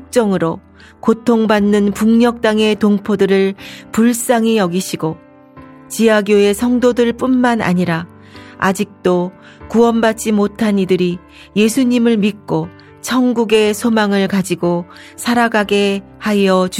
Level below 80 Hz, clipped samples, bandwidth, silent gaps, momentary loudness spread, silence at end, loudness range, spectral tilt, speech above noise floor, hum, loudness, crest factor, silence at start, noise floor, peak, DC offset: -50 dBFS; under 0.1%; 16 kHz; none; 9 LU; 0 s; 2 LU; -5.5 dB/octave; 25 dB; none; -14 LUFS; 14 dB; 0 s; -39 dBFS; -2 dBFS; under 0.1%